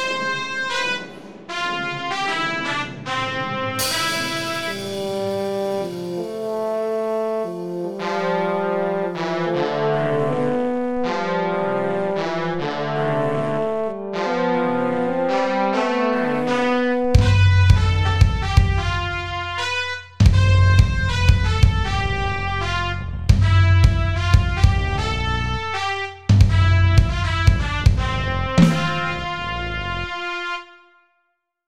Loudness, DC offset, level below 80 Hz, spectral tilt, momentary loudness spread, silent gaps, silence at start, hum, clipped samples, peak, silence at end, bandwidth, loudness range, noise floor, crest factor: -20 LUFS; 0.7%; -28 dBFS; -6 dB/octave; 10 LU; none; 0 s; none; under 0.1%; 0 dBFS; 0 s; 16 kHz; 6 LU; -71 dBFS; 18 dB